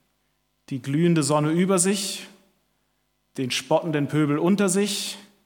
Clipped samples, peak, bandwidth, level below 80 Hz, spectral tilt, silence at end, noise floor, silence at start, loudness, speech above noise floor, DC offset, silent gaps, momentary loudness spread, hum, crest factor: under 0.1%; -6 dBFS; 18.5 kHz; -72 dBFS; -4.5 dB/octave; 0.25 s; -71 dBFS; 0.7 s; -23 LUFS; 49 dB; under 0.1%; none; 12 LU; none; 18 dB